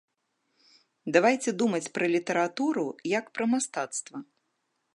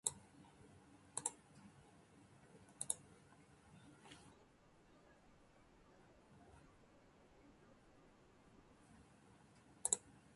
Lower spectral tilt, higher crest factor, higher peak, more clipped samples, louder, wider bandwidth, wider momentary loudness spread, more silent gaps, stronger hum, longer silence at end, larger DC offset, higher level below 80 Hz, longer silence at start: first, -4 dB/octave vs -1.5 dB/octave; second, 24 dB vs 38 dB; first, -6 dBFS vs -18 dBFS; neither; first, -27 LUFS vs -44 LUFS; about the same, 11.5 kHz vs 11.5 kHz; second, 11 LU vs 24 LU; neither; neither; first, 0.7 s vs 0 s; neither; about the same, -80 dBFS vs -78 dBFS; first, 1.05 s vs 0.05 s